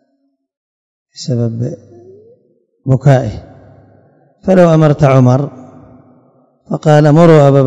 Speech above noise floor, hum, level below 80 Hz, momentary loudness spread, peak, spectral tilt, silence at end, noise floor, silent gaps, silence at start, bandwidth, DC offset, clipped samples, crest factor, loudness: 54 dB; none; -44 dBFS; 18 LU; 0 dBFS; -8.5 dB/octave; 0 s; -63 dBFS; none; 1.2 s; 8.2 kHz; under 0.1%; 2%; 12 dB; -10 LUFS